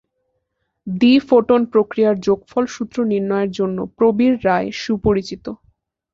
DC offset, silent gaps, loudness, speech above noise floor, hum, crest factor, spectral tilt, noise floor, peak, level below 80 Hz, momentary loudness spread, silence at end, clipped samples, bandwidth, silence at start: under 0.1%; none; -17 LUFS; 56 dB; none; 16 dB; -6.5 dB/octave; -73 dBFS; -2 dBFS; -46 dBFS; 10 LU; 0.6 s; under 0.1%; 7.4 kHz; 0.85 s